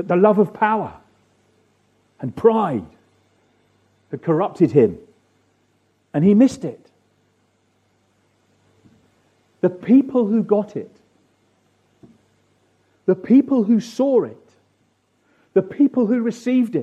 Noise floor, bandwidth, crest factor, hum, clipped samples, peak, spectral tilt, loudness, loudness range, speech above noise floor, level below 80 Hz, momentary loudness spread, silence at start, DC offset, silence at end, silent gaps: -64 dBFS; 8.8 kHz; 18 dB; none; under 0.1%; -2 dBFS; -8.5 dB/octave; -18 LUFS; 5 LU; 47 dB; -64 dBFS; 16 LU; 0 s; under 0.1%; 0 s; none